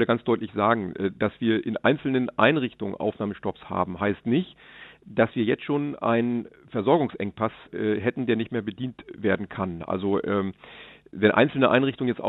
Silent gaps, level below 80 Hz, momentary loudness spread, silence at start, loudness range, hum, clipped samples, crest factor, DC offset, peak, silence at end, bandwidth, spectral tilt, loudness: none; -62 dBFS; 12 LU; 0 s; 3 LU; none; under 0.1%; 22 dB; under 0.1%; -4 dBFS; 0 s; 4.1 kHz; -9.5 dB/octave; -25 LUFS